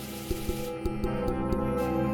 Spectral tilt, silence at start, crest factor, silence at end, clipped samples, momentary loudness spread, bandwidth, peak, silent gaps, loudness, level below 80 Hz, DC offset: -6.5 dB/octave; 0 s; 16 dB; 0 s; under 0.1%; 5 LU; 20 kHz; -14 dBFS; none; -31 LUFS; -38 dBFS; under 0.1%